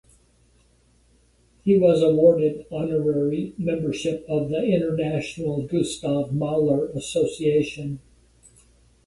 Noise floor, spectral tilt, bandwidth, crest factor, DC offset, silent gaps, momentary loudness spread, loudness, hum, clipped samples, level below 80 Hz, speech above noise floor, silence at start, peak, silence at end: -60 dBFS; -7 dB/octave; 11.5 kHz; 18 dB; under 0.1%; none; 10 LU; -23 LUFS; none; under 0.1%; -54 dBFS; 38 dB; 1.65 s; -6 dBFS; 1.05 s